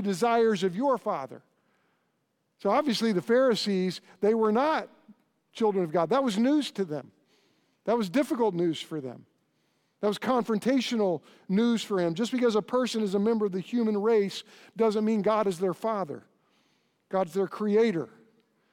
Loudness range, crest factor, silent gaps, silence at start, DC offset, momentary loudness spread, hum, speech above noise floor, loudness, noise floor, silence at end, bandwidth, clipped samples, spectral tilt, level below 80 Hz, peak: 3 LU; 16 dB; none; 0 s; under 0.1%; 10 LU; none; 49 dB; -27 LUFS; -76 dBFS; 0.65 s; 16.5 kHz; under 0.1%; -6 dB/octave; -76 dBFS; -12 dBFS